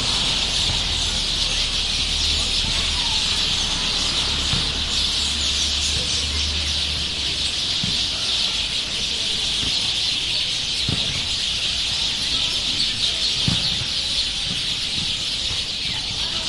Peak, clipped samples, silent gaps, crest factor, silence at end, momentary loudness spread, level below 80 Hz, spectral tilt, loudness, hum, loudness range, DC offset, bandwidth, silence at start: -6 dBFS; under 0.1%; none; 16 dB; 0 s; 3 LU; -34 dBFS; -1.5 dB/octave; -19 LUFS; none; 1 LU; under 0.1%; 11.5 kHz; 0 s